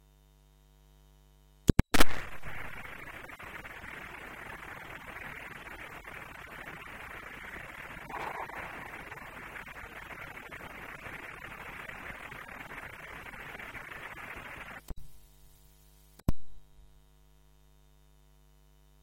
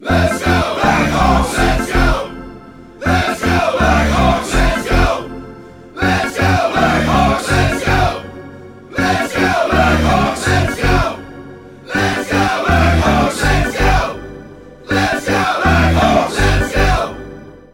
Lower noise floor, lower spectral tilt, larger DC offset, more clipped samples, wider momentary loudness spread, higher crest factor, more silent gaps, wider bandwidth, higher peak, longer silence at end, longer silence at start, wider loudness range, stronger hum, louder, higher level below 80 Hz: first, -61 dBFS vs -36 dBFS; about the same, -4.5 dB/octave vs -5.5 dB/octave; neither; neither; second, 11 LU vs 17 LU; first, 30 dB vs 14 dB; neither; about the same, 16.5 kHz vs 17 kHz; about the same, -4 dBFS vs -2 dBFS; second, 0 s vs 0.15 s; about the same, 0 s vs 0 s; first, 11 LU vs 0 LU; neither; second, -39 LUFS vs -14 LUFS; second, -46 dBFS vs -22 dBFS